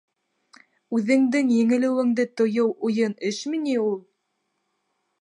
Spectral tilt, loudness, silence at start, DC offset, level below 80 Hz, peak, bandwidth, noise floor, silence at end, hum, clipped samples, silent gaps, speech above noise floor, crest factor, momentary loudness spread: -5.5 dB/octave; -23 LUFS; 0.9 s; under 0.1%; -76 dBFS; -8 dBFS; 10 kHz; -75 dBFS; 1.2 s; none; under 0.1%; none; 54 dB; 16 dB; 7 LU